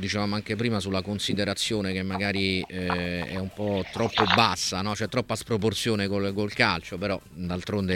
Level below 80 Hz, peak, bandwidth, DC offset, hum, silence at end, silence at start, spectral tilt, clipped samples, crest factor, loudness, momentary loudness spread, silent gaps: -54 dBFS; -2 dBFS; 16.5 kHz; under 0.1%; none; 0 s; 0 s; -4.5 dB/octave; under 0.1%; 24 dB; -27 LUFS; 8 LU; none